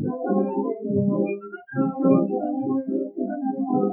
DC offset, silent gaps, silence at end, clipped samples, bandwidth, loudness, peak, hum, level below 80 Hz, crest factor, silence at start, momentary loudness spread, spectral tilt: under 0.1%; none; 0 s; under 0.1%; 2.8 kHz; -24 LUFS; -6 dBFS; none; -72 dBFS; 18 dB; 0 s; 8 LU; -14.5 dB/octave